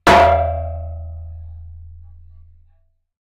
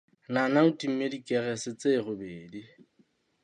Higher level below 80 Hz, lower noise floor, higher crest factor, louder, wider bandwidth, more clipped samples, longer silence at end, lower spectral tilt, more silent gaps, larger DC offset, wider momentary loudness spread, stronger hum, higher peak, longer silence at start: first, -36 dBFS vs -72 dBFS; second, -58 dBFS vs -68 dBFS; about the same, 16 dB vs 20 dB; first, -16 LUFS vs -28 LUFS; first, 16 kHz vs 10.5 kHz; neither; first, 1.2 s vs 0.75 s; about the same, -5.5 dB/octave vs -5.5 dB/octave; neither; neither; first, 27 LU vs 19 LU; neither; first, -2 dBFS vs -10 dBFS; second, 0.05 s vs 0.3 s